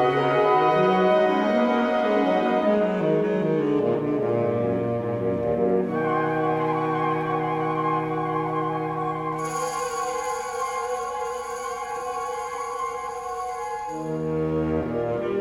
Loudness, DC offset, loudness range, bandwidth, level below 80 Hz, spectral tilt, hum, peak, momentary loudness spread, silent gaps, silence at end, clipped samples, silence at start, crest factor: -24 LUFS; under 0.1%; 8 LU; 16 kHz; -54 dBFS; -6 dB/octave; none; -8 dBFS; 10 LU; none; 0 s; under 0.1%; 0 s; 16 dB